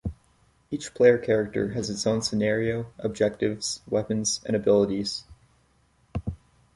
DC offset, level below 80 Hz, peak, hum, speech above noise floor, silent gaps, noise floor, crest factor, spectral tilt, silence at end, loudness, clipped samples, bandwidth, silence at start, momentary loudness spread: under 0.1%; -48 dBFS; -6 dBFS; none; 39 dB; none; -64 dBFS; 20 dB; -4.5 dB/octave; 0.4 s; -26 LUFS; under 0.1%; 11.5 kHz; 0.05 s; 15 LU